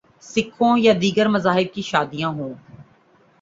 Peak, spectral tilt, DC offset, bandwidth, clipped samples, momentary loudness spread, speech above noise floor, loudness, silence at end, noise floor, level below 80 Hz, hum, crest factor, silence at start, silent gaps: -2 dBFS; -5.5 dB/octave; under 0.1%; 7.8 kHz; under 0.1%; 12 LU; 37 dB; -20 LUFS; 0.6 s; -56 dBFS; -58 dBFS; none; 18 dB; 0.25 s; none